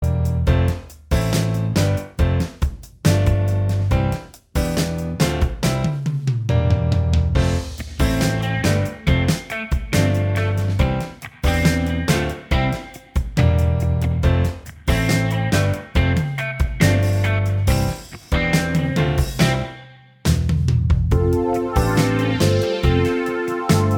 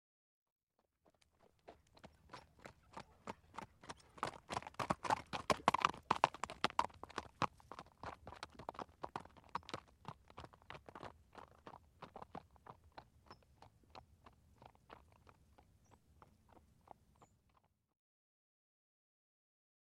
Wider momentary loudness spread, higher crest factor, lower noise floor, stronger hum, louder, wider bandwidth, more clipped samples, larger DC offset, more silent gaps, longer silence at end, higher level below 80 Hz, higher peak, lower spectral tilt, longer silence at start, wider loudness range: second, 6 LU vs 26 LU; second, 16 dB vs 36 dB; second, -43 dBFS vs -80 dBFS; neither; first, -20 LUFS vs -43 LUFS; first, 18.5 kHz vs 15 kHz; neither; neither; neither; second, 0 s vs 3.35 s; first, -28 dBFS vs -70 dBFS; first, -2 dBFS vs -12 dBFS; first, -6 dB/octave vs -4 dB/octave; second, 0 s vs 1.7 s; second, 2 LU vs 24 LU